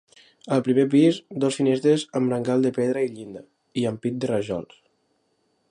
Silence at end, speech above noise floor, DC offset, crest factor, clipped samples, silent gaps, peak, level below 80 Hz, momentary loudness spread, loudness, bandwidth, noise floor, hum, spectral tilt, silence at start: 1.05 s; 47 dB; under 0.1%; 16 dB; under 0.1%; none; -8 dBFS; -66 dBFS; 13 LU; -23 LUFS; 11.5 kHz; -69 dBFS; none; -6.5 dB/octave; 0.45 s